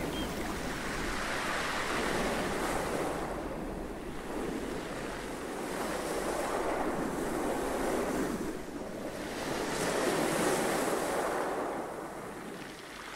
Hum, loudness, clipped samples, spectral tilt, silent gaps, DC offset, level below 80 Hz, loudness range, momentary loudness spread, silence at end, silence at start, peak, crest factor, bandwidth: none; -34 LUFS; under 0.1%; -4 dB/octave; none; under 0.1%; -50 dBFS; 4 LU; 10 LU; 0 s; 0 s; -18 dBFS; 16 dB; 16 kHz